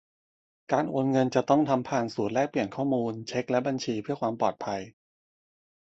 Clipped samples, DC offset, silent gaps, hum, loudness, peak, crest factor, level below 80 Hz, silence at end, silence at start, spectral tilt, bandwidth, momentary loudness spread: under 0.1%; under 0.1%; none; none; -28 LUFS; -10 dBFS; 20 dB; -68 dBFS; 1.05 s; 0.7 s; -6.5 dB/octave; 8 kHz; 8 LU